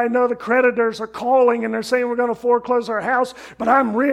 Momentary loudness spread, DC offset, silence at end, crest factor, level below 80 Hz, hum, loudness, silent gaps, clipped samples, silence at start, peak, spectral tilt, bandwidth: 6 LU; under 0.1%; 0 s; 16 dB; -60 dBFS; none; -19 LUFS; none; under 0.1%; 0 s; -2 dBFS; -5 dB/octave; 12.5 kHz